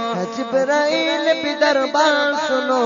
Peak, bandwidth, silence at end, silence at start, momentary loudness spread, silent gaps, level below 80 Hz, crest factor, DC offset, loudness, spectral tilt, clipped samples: -2 dBFS; 7.4 kHz; 0 s; 0 s; 5 LU; none; -68 dBFS; 16 dB; under 0.1%; -18 LUFS; -3.5 dB/octave; under 0.1%